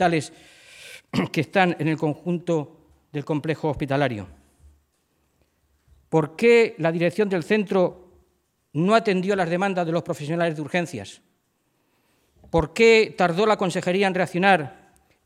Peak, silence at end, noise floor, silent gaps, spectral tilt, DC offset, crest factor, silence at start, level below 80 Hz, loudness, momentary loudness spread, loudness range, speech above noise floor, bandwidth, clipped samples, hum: -4 dBFS; 0.55 s; -70 dBFS; none; -6 dB/octave; under 0.1%; 20 dB; 0 s; -52 dBFS; -22 LUFS; 16 LU; 7 LU; 48 dB; 13.5 kHz; under 0.1%; none